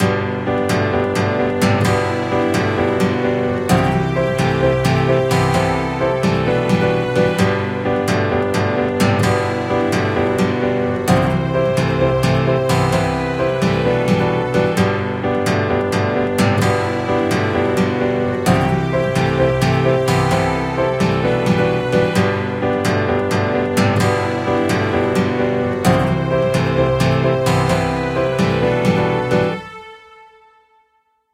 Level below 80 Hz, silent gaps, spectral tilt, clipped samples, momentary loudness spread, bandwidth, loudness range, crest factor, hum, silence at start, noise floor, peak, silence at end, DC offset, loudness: -38 dBFS; none; -6.5 dB/octave; under 0.1%; 3 LU; 16 kHz; 1 LU; 16 dB; none; 0 s; -63 dBFS; 0 dBFS; 1.35 s; under 0.1%; -17 LUFS